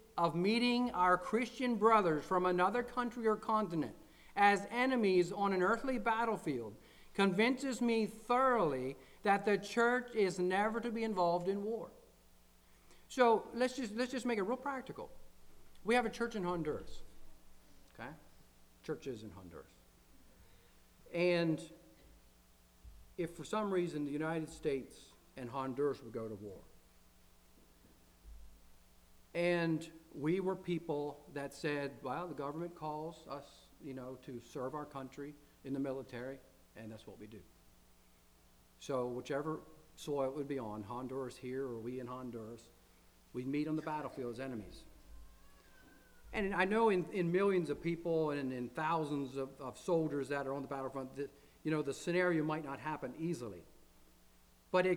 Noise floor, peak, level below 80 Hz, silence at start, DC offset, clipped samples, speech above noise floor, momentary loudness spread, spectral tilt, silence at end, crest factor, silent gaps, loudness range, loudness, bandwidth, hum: -66 dBFS; -16 dBFS; -64 dBFS; 0 s; under 0.1%; under 0.1%; 30 dB; 18 LU; -6 dB/octave; 0 s; 22 dB; none; 12 LU; -37 LUFS; over 20 kHz; none